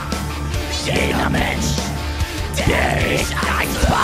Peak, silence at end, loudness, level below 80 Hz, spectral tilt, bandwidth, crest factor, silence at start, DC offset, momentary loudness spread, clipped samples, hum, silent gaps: -2 dBFS; 0 s; -19 LUFS; -26 dBFS; -4.5 dB/octave; 16 kHz; 16 dB; 0 s; 0.1%; 7 LU; under 0.1%; none; none